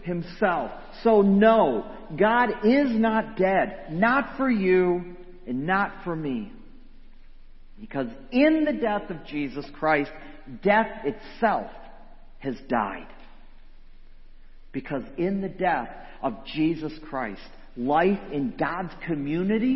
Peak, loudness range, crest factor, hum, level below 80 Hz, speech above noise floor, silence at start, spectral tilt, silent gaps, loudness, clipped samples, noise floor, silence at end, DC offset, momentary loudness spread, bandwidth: -4 dBFS; 10 LU; 20 dB; none; -46 dBFS; 19 dB; 0 s; -9.5 dB/octave; none; -25 LUFS; under 0.1%; -44 dBFS; 0 s; under 0.1%; 14 LU; 6 kHz